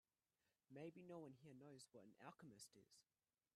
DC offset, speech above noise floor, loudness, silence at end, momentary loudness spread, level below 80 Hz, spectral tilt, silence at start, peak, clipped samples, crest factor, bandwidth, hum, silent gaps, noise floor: under 0.1%; over 27 dB; -63 LUFS; 0.55 s; 6 LU; under -90 dBFS; -5 dB/octave; 0.45 s; -44 dBFS; under 0.1%; 20 dB; 13.5 kHz; none; none; under -90 dBFS